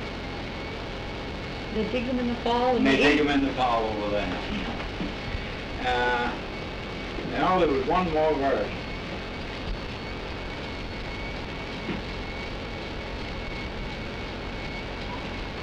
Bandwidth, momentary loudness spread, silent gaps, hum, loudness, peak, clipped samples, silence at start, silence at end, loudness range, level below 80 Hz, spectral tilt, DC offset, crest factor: 10.5 kHz; 12 LU; none; none; -28 LUFS; -10 dBFS; under 0.1%; 0 s; 0 s; 9 LU; -40 dBFS; -6 dB/octave; under 0.1%; 18 dB